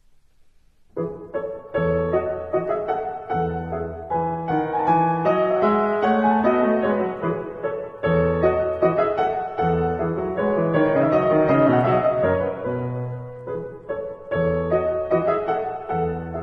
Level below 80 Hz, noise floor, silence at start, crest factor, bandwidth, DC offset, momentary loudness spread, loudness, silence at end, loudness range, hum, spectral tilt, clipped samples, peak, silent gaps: -46 dBFS; -54 dBFS; 0.95 s; 16 dB; 5.8 kHz; under 0.1%; 12 LU; -22 LUFS; 0 s; 5 LU; none; -10 dB/octave; under 0.1%; -6 dBFS; none